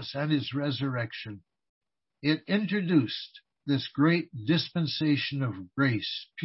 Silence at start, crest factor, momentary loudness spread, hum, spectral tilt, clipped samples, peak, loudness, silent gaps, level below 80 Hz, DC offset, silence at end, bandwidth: 0 s; 18 dB; 11 LU; none; -9.5 dB/octave; under 0.1%; -12 dBFS; -29 LUFS; 1.69-1.81 s; -70 dBFS; under 0.1%; 0 s; 6 kHz